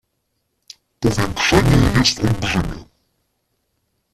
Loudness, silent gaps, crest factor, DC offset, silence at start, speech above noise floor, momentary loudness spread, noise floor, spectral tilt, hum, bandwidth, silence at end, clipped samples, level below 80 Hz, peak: -17 LUFS; none; 18 dB; under 0.1%; 1 s; 55 dB; 9 LU; -71 dBFS; -5 dB/octave; none; 14.5 kHz; 1.3 s; under 0.1%; -32 dBFS; -2 dBFS